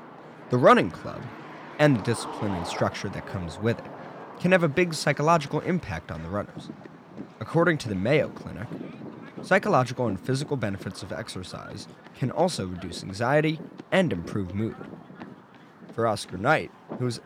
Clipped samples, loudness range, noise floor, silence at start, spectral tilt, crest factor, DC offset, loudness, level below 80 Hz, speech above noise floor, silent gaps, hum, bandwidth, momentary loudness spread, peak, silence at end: under 0.1%; 3 LU; -50 dBFS; 0 s; -6 dB/octave; 20 dB; under 0.1%; -26 LUFS; -56 dBFS; 24 dB; none; none; 15.5 kHz; 20 LU; -6 dBFS; 0.05 s